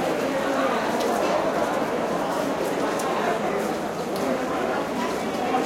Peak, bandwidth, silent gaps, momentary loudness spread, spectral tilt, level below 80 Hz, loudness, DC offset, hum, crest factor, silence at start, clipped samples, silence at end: -10 dBFS; 16.5 kHz; none; 3 LU; -4.5 dB/octave; -56 dBFS; -25 LUFS; under 0.1%; none; 14 dB; 0 s; under 0.1%; 0 s